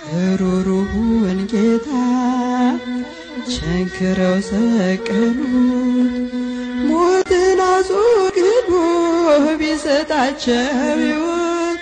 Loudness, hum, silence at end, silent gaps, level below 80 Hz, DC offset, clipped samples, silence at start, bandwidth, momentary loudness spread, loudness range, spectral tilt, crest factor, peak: -17 LUFS; none; 0 s; none; -40 dBFS; under 0.1%; under 0.1%; 0 s; 9.6 kHz; 7 LU; 4 LU; -6 dB/octave; 12 dB; -4 dBFS